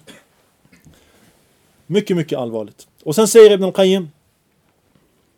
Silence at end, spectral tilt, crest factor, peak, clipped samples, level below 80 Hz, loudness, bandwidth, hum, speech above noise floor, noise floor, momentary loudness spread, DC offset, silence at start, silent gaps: 1.3 s; -5 dB/octave; 18 dB; 0 dBFS; under 0.1%; -66 dBFS; -14 LUFS; 18 kHz; none; 47 dB; -61 dBFS; 21 LU; under 0.1%; 1.9 s; none